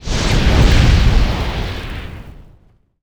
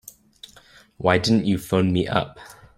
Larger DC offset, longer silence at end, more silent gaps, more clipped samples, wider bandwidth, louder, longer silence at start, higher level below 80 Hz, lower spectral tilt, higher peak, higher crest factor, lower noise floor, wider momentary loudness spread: neither; first, 0.6 s vs 0.25 s; neither; neither; second, 13.5 kHz vs 16 kHz; first, -15 LUFS vs -21 LUFS; second, 0 s vs 1 s; first, -16 dBFS vs -52 dBFS; about the same, -5.5 dB/octave vs -6 dB/octave; about the same, -2 dBFS vs -2 dBFS; second, 12 dB vs 20 dB; about the same, -50 dBFS vs -52 dBFS; first, 18 LU vs 7 LU